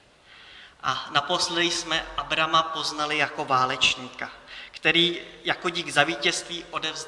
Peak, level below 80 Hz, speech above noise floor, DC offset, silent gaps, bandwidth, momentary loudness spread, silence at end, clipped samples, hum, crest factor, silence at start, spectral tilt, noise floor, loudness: -2 dBFS; -56 dBFS; 25 dB; under 0.1%; none; 12 kHz; 11 LU; 0 s; under 0.1%; none; 24 dB; 0.3 s; -2 dB/octave; -51 dBFS; -24 LUFS